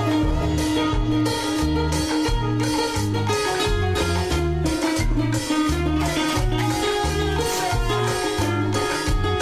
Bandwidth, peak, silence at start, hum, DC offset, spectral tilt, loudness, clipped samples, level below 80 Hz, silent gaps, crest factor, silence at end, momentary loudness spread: 16 kHz; -10 dBFS; 0 s; none; under 0.1%; -5 dB/octave; -22 LUFS; under 0.1%; -28 dBFS; none; 12 dB; 0 s; 1 LU